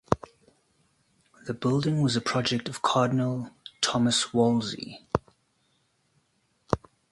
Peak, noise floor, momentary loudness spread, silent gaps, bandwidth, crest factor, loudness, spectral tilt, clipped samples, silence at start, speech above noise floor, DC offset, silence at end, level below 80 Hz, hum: -2 dBFS; -71 dBFS; 11 LU; none; 11.5 kHz; 26 dB; -27 LUFS; -5 dB/octave; under 0.1%; 0.1 s; 45 dB; under 0.1%; 0.35 s; -54 dBFS; none